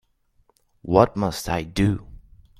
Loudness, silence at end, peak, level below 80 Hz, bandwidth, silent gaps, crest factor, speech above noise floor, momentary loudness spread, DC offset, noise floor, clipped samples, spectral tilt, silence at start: -22 LUFS; 0.4 s; -2 dBFS; -42 dBFS; 15.5 kHz; none; 22 dB; 43 dB; 11 LU; under 0.1%; -64 dBFS; under 0.1%; -6.5 dB/octave; 0.85 s